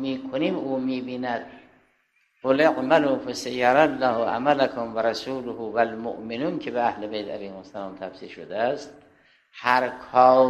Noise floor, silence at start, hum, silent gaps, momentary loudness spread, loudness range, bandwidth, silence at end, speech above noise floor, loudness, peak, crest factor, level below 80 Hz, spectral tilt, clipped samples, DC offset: -67 dBFS; 0 s; none; none; 16 LU; 8 LU; 13 kHz; 0 s; 44 dB; -24 LUFS; -2 dBFS; 22 dB; -64 dBFS; -5.5 dB/octave; under 0.1%; under 0.1%